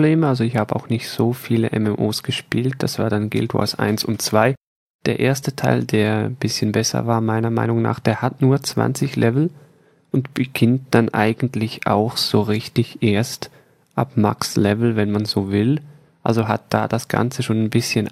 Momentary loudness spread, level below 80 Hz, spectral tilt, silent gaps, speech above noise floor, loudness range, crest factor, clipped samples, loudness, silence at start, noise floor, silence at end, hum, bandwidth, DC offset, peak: 6 LU; -56 dBFS; -6 dB/octave; 4.57-4.61 s, 4.67-4.99 s; 27 dB; 1 LU; 18 dB; under 0.1%; -20 LUFS; 0 s; -45 dBFS; 0 s; none; 15.5 kHz; under 0.1%; 0 dBFS